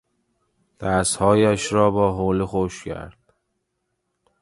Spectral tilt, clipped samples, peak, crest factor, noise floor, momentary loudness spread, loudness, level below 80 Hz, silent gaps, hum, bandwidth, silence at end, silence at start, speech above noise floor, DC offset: -5 dB/octave; under 0.1%; -2 dBFS; 20 dB; -75 dBFS; 16 LU; -20 LUFS; -44 dBFS; none; none; 11.5 kHz; 1.3 s; 0.8 s; 55 dB; under 0.1%